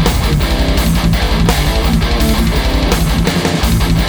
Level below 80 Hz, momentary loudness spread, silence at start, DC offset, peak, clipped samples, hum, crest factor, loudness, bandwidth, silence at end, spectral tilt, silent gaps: -16 dBFS; 1 LU; 0 s; under 0.1%; 0 dBFS; under 0.1%; none; 12 dB; -13 LUFS; over 20 kHz; 0 s; -5 dB/octave; none